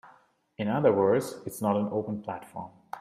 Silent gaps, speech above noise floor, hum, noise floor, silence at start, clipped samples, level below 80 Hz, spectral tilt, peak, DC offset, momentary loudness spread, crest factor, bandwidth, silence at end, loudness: none; 34 dB; none; -61 dBFS; 0.05 s; under 0.1%; -70 dBFS; -7 dB/octave; -10 dBFS; under 0.1%; 18 LU; 20 dB; 15.5 kHz; 0 s; -28 LUFS